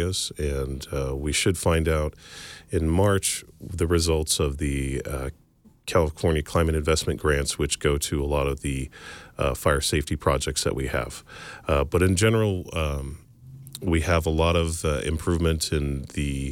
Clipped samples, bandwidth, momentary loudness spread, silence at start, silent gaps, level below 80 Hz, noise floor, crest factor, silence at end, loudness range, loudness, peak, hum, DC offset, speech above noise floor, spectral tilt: under 0.1%; 17 kHz; 12 LU; 0 s; none; -34 dBFS; -45 dBFS; 18 dB; 0 s; 2 LU; -25 LUFS; -8 dBFS; none; under 0.1%; 20 dB; -4.5 dB/octave